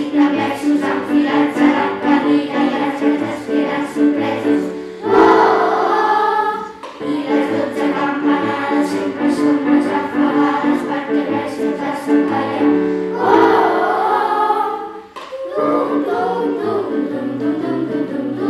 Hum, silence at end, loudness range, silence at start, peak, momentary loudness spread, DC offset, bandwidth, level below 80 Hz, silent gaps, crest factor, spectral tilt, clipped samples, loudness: none; 0 s; 3 LU; 0 s; -2 dBFS; 8 LU; under 0.1%; 12 kHz; -56 dBFS; none; 14 dB; -6 dB/octave; under 0.1%; -16 LUFS